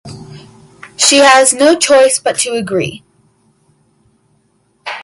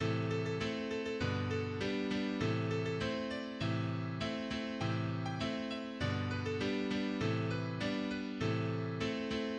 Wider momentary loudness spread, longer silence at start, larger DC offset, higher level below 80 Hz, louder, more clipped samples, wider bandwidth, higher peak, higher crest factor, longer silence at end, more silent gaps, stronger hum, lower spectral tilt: first, 22 LU vs 3 LU; about the same, 0.05 s vs 0 s; neither; first, -54 dBFS vs -60 dBFS; first, -9 LUFS vs -37 LUFS; neither; first, 16 kHz vs 9.4 kHz; first, 0 dBFS vs -22 dBFS; about the same, 14 dB vs 14 dB; about the same, 0 s vs 0 s; neither; neither; second, -2 dB/octave vs -6.5 dB/octave